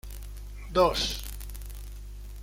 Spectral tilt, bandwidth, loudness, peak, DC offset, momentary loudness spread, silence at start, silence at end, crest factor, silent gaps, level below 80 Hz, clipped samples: -4 dB/octave; 17 kHz; -27 LUFS; -10 dBFS; under 0.1%; 20 LU; 0.05 s; 0 s; 20 dB; none; -40 dBFS; under 0.1%